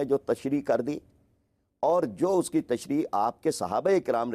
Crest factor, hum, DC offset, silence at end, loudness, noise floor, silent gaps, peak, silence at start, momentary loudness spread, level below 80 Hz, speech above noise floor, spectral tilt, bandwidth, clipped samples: 14 dB; none; under 0.1%; 0 s; -27 LUFS; -72 dBFS; none; -14 dBFS; 0 s; 5 LU; -66 dBFS; 45 dB; -6 dB/octave; 15.5 kHz; under 0.1%